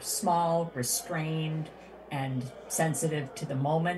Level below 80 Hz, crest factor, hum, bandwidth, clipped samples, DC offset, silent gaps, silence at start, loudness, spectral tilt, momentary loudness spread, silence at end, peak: -64 dBFS; 16 dB; none; 13 kHz; under 0.1%; under 0.1%; none; 0 s; -31 LUFS; -4.5 dB/octave; 10 LU; 0 s; -16 dBFS